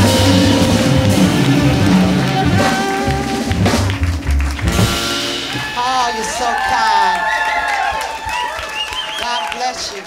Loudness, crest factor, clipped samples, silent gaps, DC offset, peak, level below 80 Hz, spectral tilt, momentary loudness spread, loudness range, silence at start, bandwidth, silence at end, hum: -15 LUFS; 14 dB; under 0.1%; none; under 0.1%; 0 dBFS; -28 dBFS; -4.5 dB/octave; 8 LU; 3 LU; 0 s; 16.5 kHz; 0 s; none